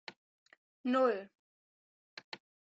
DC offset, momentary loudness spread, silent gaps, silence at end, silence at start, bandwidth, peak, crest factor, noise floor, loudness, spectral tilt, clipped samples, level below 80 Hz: under 0.1%; 24 LU; 0.16-0.46 s, 0.57-0.84 s, 1.35-2.17 s, 2.24-2.32 s; 0.4 s; 0.1 s; 7.8 kHz; -18 dBFS; 20 dB; under -90 dBFS; -33 LUFS; -5 dB/octave; under 0.1%; -90 dBFS